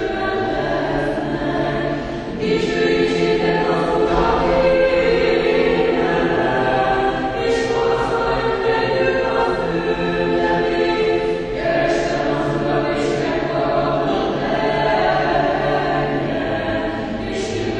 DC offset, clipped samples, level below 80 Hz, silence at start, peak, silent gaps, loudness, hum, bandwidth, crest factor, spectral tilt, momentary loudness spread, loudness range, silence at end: under 0.1%; under 0.1%; -36 dBFS; 0 s; -4 dBFS; none; -18 LUFS; none; 9.8 kHz; 14 dB; -6 dB/octave; 5 LU; 3 LU; 0 s